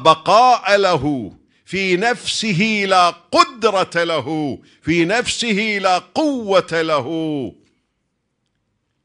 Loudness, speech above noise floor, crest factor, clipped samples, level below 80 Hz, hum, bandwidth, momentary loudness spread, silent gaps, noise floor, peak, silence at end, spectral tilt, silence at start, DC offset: -17 LUFS; 54 dB; 18 dB; under 0.1%; -52 dBFS; none; 10.5 kHz; 11 LU; none; -71 dBFS; 0 dBFS; 1.55 s; -4 dB/octave; 0 s; under 0.1%